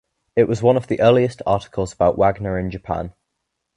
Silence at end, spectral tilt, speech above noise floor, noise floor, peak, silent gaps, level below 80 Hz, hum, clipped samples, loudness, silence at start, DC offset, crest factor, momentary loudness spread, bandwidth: 0.65 s; -7 dB/octave; 59 dB; -77 dBFS; -2 dBFS; none; -42 dBFS; none; under 0.1%; -19 LUFS; 0.35 s; under 0.1%; 18 dB; 11 LU; 10.5 kHz